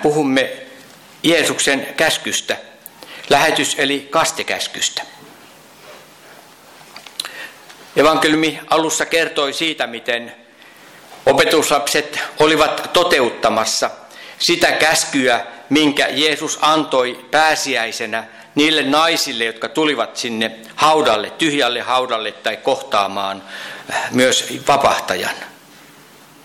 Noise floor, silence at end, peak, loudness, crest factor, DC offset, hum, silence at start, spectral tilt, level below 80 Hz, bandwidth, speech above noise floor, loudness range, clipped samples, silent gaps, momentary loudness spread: -44 dBFS; 0.9 s; -4 dBFS; -16 LUFS; 14 dB; under 0.1%; none; 0 s; -2.5 dB/octave; -54 dBFS; 17.5 kHz; 27 dB; 4 LU; under 0.1%; none; 12 LU